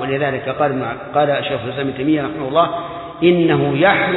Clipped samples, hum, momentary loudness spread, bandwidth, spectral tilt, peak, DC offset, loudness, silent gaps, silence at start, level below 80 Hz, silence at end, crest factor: under 0.1%; none; 9 LU; 4.1 kHz; -10 dB/octave; -2 dBFS; under 0.1%; -17 LUFS; none; 0 s; -50 dBFS; 0 s; 16 dB